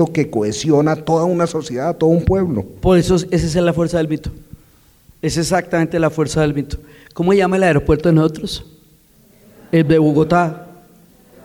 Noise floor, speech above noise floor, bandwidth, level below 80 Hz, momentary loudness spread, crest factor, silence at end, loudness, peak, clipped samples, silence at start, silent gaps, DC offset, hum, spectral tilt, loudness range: -50 dBFS; 35 dB; 16 kHz; -36 dBFS; 11 LU; 14 dB; 0.75 s; -16 LUFS; -4 dBFS; under 0.1%; 0 s; none; under 0.1%; none; -6.5 dB/octave; 3 LU